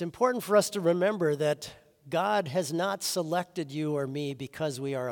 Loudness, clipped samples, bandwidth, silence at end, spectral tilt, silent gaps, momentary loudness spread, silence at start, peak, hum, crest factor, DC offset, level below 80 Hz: -29 LUFS; under 0.1%; 18 kHz; 0 s; -4.5 dB/octave; none; 9 LU; 0 s; -10 dBFS; none; 18 dB; under 0.1%; -72 dBFS